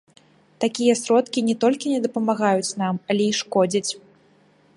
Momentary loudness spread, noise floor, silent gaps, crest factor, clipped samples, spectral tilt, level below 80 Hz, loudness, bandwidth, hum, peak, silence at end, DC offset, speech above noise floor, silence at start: 6 LU; -57 dBFS; none; 18 dB; under 0.1%; -4.5 dB/octave; -70 dBFS; -22 LUFS; 11.5 kHz; none; -6 dBFS; 0.8 s; under 0.1%; 36 dB; 0.6 s